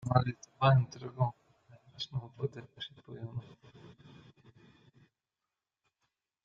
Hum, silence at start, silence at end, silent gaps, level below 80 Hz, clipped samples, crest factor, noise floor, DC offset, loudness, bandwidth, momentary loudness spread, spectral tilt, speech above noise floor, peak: none; 0 s; 2.55 s; none; -68 dBFS; under 0.1%; 26 dB; under -90 dBFS; under 0.1%; -34 LUFS; 7.2 kHz; 19 LU; -7 dB/octave; over 60 dB; -10 dBFS